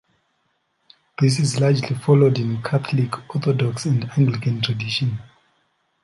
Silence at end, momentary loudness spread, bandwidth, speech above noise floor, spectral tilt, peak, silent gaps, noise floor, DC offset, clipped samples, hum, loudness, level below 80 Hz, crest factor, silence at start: 0.75 s; 8 LU; 11.5 kHz; 50 dB; -6.5 dB/octave; -4 dBFS; none; -69 dBFS; under 0.1%; under 0.1%; none; -20 LUFS; -58 dBFS; 18 dB; 1.2 s